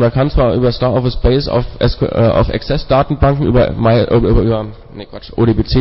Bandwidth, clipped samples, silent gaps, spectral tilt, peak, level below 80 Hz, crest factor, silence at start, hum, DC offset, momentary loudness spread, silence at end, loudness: 5.8 kHz; under 0.1%; none; -11.5 dB/octave; -2 dBFS; -22 dBFS; 10 dB; 0 s; none; under 0.1%; 8 LU; 0 s; -13 LUFS